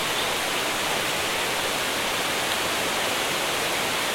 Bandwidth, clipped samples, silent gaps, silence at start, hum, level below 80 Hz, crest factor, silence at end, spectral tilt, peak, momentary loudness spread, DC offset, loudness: 16.5 kHz; under 0.1%; none; 0 s; none; -54 dBFS; 16 dB; 0 s; -1 dB/octave; -10 dBFS; 0 LU; under 0.1%; -24 LUFS